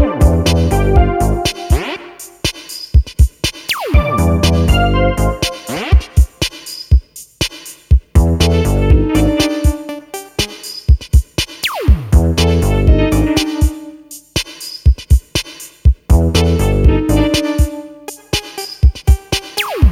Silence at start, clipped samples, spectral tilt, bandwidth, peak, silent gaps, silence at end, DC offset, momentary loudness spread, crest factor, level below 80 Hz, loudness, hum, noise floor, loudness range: 0 s; under 0.1%; -5.5 dB/octave; 16.5 kHz; 0 dBFS; none; 0 s; under 0.1%; 11 LU; 12 dB; -16 dBFS; -14 LUFS; none; -34 dBFS; 2 LU